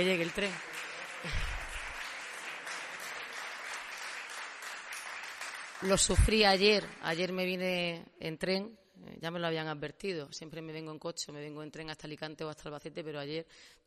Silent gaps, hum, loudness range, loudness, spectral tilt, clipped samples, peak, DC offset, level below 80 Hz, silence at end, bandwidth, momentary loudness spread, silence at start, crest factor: none; none; 12 LU; -35 LUFS; -3.5 dB/octave; under 0.1%; -12 dBFS; under 0.1%; -44 dBFS; 0.15 s; 13.5 kHz; 16 LU; 0 s; 24 dB